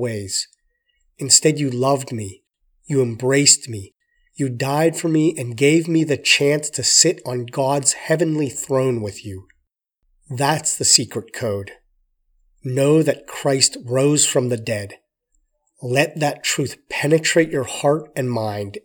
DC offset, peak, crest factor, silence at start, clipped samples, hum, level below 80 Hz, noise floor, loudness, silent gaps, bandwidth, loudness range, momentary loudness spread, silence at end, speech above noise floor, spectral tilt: under 0.1%; 0 dBFS; 20 dB; 0 s; under 0.1%; none; -62 dBFS; -70 dBFS; -18 LUFS; none; over 20 kHz; 4 LU; 16 LU; 0.05 s; 51 dB; -3.5 dB/octave